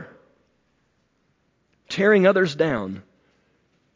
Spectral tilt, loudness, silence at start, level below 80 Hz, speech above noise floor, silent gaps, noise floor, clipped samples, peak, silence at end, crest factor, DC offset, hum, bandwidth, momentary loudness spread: -6.5 dB/octave; -20 LUFS; 0 s; -60 dBFS; 49 dB; none; -68 dBFS; under 0.1%; -4 dBFS; 0.95 s; 20 dB; under 0.1%; none; 7.6 kHz; 17 LU